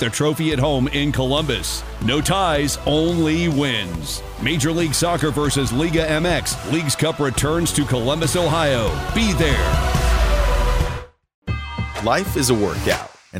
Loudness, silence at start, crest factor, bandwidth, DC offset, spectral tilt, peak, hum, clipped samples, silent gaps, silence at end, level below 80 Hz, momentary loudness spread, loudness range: -19 LUFS; 0 s; 16 dB; 16 kHz; under 0.1%; -4.5 dB/octave; -2 dBFS; none; under 0.1%; 11.34-11.42 s; 0 s; -26 dBFS; 6 LU; 2 LU